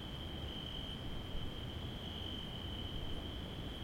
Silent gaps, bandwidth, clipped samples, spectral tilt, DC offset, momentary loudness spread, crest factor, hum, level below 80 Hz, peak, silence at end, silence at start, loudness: none; 16.5 kHz; under 0.1%; -5.5 dB/octave; under 0.1%; 2 LU; 16 dB; none; -48 dBFS; -28 dBFS; 0 s; 0 s; -44 LUFS